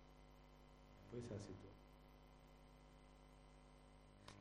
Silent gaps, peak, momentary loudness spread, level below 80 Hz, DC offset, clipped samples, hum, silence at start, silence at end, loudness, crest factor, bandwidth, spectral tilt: none; -40 dBFS; 14 LU; -68 dBFS; under 0.1%; under 0.1%; none; 0 s; 0 s; -61 LUFS; 22 dB; 13.5 kHz; -6 dB/octave